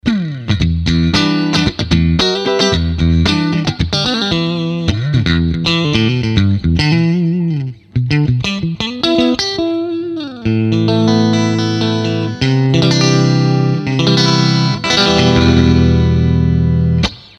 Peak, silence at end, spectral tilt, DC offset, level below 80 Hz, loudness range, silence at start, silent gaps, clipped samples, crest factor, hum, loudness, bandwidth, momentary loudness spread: 0 dBFS; 0.2 s; -6 dB/octave; under 0.1%; -28 dBFS; 4 LU; 0.05 s; none; under 0.1%; 12 dB; 50 Hz at -40 dBFS; -13 LUFS; 8.8 kHz; 6 LU